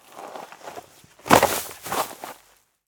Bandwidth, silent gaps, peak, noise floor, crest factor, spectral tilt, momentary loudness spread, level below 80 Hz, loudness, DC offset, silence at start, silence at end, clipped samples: over 20 kHz; none; 0 dBFS; -59 dBFS; 26 dB; -3 dB/octave; 23 LU; -54 dBFS; -21 LUFS; under 0.1%; 0.15 s; 0.55 s; under 0.1%